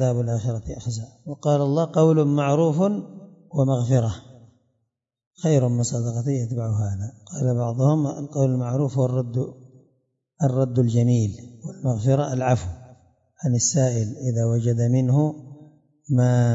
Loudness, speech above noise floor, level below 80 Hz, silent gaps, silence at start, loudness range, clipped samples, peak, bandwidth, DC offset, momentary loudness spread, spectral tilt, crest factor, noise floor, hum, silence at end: -22 LUFS; 56 dB; -54 dBFS; 5.27-5.31 s; 0 s; 3 LU; under 0.1%; -6 dBFS; 8 kHz; under 0.1%; 11 LU; -7 dB/octave; 16 dB; -78 dBFS; none; 0 s